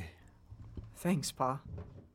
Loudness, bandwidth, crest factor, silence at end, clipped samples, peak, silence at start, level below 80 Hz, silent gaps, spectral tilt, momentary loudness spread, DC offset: -36 LUFS; 16.5 kHz; 20 dB; 0.05 s; under 0.1%; -18 dBFS; 0 s; -56 dBFS; none; -5.5 dB/octave; 18 LU; under 0.1%